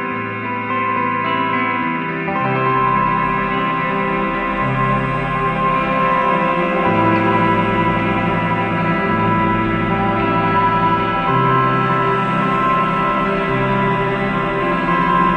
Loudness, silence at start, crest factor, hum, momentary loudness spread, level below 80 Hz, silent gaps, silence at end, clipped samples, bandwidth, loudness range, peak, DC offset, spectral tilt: -17 LUFS; 0 s; 14 dB; none; 4 LU; -38 dBFS; none; 0 s; under 0.1%; 8.8 kHz; 2 LU; -2 dBFS; 0.2%; -8 dB/octave